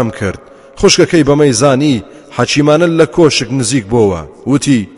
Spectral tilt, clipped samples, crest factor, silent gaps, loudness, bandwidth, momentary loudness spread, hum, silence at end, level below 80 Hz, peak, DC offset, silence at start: -5 dB/octave; 0.2%; 10 dB; none; -11 LUFS; 11.5 kHz; 11 LU; none; 0.1 s; -36 dBFS; 0 dBFS; under 0.1%; 0 s